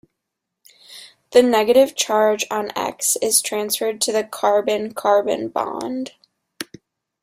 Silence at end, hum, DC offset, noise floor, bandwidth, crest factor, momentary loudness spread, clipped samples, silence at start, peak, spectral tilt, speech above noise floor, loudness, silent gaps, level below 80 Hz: 0.6 s; none; under 0.1%; -80 dBFS; 16 kHz; 18 dB; 19 LU; under 0.1%; 0.9 s; -2 dBFS; -2 dB/octave; 62 dB; -19 LUFS; none; -64 dBFS